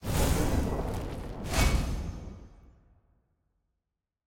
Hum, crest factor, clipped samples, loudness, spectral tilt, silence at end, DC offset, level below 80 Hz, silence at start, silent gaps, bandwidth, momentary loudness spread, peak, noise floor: none; 18 dB; under 0.1%; -31 LUFS; -5 dB/octave; 1.7 s; under 0.1%; -34 dBFS; 0 s; none; 17 kHz; 16 LU; -12 dBFS; -86 dBFS